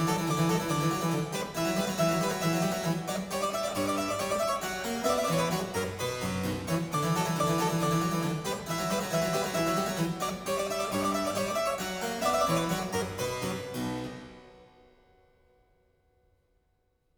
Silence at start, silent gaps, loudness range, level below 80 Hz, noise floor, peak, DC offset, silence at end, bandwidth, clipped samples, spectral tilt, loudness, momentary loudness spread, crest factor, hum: 0 s; none; 7 LU; -56 dBFS; -73 dBFS; -14 dBFS; under 0.1%; 2.5 s; over 20 kHz; under 0.1%; -4.5 dB/octave; -30 LUFS; 6 LU; 16 dB; none